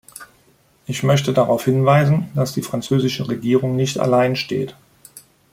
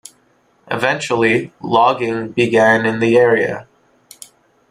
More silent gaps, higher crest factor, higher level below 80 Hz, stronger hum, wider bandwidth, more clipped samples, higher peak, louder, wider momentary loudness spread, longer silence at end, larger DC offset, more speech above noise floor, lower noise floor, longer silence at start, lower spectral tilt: neither; about the same, 16 dB vs 16 dB; about the same, -56 dBFS vs -56 dBFS; neither; first, 16 kHz vs 13 kHz; neither; about the same, -2 dBFS vs -2 dBFS; second, -18 LUFS vs -15 LUFS; first, 13 LU vs 8 LU; second, 0.35 s vs 1.1 s; neither; about the same, 39 dB vs 42 dB; about the same, -56 dBFS vs -57 dBFS; second, 0.2 s vs 0.7 s; about the same, -6 dB/octave vs -5.5 dB/octave